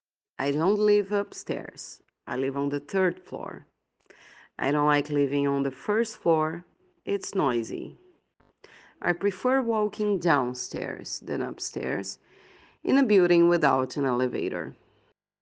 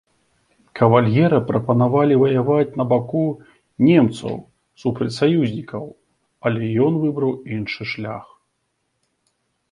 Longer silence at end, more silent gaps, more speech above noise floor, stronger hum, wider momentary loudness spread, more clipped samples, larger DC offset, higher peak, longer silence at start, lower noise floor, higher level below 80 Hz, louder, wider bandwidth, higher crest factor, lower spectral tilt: second, 0.7 s vs 1.5 s; neither; second, 42 dB vs 54 dB; neither; about the same, 16 LU vs 15 LU; neither; neither; second, -6 dBFS vs 0 dBFS; second, 0.4 s vs 0.75 s; second, -68 dBFS vs -72 dBFS; second, -72 dBFS vs -56 dBFS; second, -26 LUFS vs -19 LUFS; second, 9.6 kHz vs 11 kHz; about the same, 22 dB vs 20 dB; second, -5.5 dB/octave vs -8.5 dB/octave